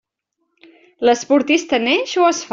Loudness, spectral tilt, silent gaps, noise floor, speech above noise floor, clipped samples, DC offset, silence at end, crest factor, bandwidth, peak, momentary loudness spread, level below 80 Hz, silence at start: -16 LUFS; -2 dB/octave; none; -73 dBFS; 57 dB; under 0.1%; under 0.1%; 0.05 s; 16 dB; 7.8 kHz; -2 dBFS; 2 LU; -62 dBFS; 1 s